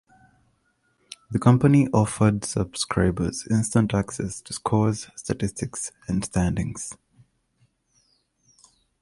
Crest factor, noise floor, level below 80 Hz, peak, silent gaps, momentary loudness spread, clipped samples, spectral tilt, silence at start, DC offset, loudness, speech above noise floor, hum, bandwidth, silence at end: 20 dB; -68 dBFS; -44 dBFS; -6 dBFS; none; 13 LU; under 0.1%; -6 dB/octave; 1.3 s; under 0.1%; -24 LUFS; 46 dB; none; 11.5 kHz; 2.1 s